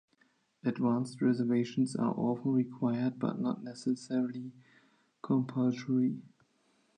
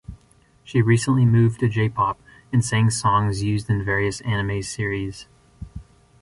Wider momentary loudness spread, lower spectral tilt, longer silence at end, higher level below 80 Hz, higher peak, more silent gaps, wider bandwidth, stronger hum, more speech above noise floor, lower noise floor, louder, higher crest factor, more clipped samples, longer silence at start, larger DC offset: second, 7 LU vs 15 LU; first, -7.5 dB/octave vs -6 dB/octave; first, 0.75 s vs 0.4 s; second, -80 dBFS vs -44 dBFS; second, -18 dBFS vs -6 dBFS; neither; second, 9.8 kHz vs 11.5 kHz; neither; first, 40 dB vs 36 dB; first, -72 dBFS vs -56 dBFS; second, -32 LUFS vs -21 LUFS; about the same, 16 dB vs 16 dB; neither; first, 0.65 s vs 0.1 s; neither